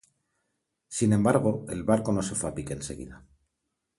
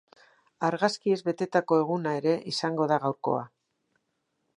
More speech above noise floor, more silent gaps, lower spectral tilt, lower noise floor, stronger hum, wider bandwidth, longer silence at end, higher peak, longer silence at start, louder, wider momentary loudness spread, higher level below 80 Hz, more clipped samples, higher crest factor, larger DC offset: first, 55 dB vs 51 dB; neither; about the same, -6 dB/octave vs -5.5 dB/octave; first, -82 dBFS vs -78 dBFS; neither; about the same, 11.5 kHz vs 10.5 kHz; second, 0.8 s vs 1.1 s; about the same, -8 dBFS vs -8 dBFS; first, 0.9 s vs 0.6 s; about the same, -27 LUFS vs -27 LUFS; first, 14 LU vs 6 LU; first, -52 dBFS vs -80 dBFS; neither; about the same, 20 dB vs 20 dB; neither